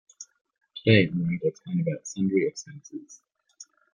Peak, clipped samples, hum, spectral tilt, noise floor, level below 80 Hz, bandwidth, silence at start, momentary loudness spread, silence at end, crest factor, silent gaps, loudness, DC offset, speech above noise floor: -4 dBFS; under 0.1%; none; -6 dB/octave; -53 dBFS; -64 dBFS; 9.8 kHz; 0.2 s; 24 LU; 0.3 s; 24 dB; 0.41-0.45 s; -25 LUFS; under 0.1%; 27 dB